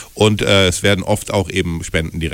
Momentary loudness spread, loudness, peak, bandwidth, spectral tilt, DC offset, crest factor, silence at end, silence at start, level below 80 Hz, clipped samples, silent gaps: 8 LU; -16 LUFS; -2 dBFS; 16.5 kHz; -4.5 dB/octave; under 0.1%; 14 dB; 0 s; 0 s; -34 dBFS; under 0.1%; none